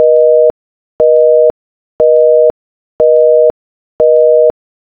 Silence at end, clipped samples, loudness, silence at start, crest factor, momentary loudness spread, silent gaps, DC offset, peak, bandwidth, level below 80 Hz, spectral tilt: 0.5 s; 0.2%; -9 LUFS; 0 s; 10 dB; 6 LU; 0.50-0.99 s, 1.50-1.99 s, 2.50-2.99 s, 3.50-3.99 s; under 0.1%; 0 dBFS; 2.1 kHz; -48 dBFS; -9 dB/octave